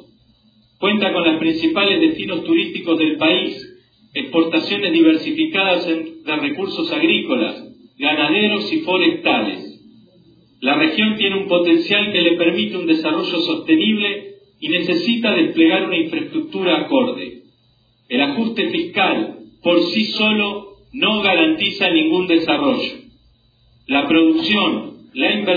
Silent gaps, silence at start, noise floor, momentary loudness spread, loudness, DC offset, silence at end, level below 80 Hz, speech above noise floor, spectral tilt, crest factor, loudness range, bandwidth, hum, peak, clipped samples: none; 0.8 s; -58 dBFS; 9 LU; -17 LUFS; under 0.1%; 0 s; -60 dBFS; 41 dB; -6.5 dB/octave; 16 dB; 3 LU; 5 kHz; none; -2 dBFS; under 0.1%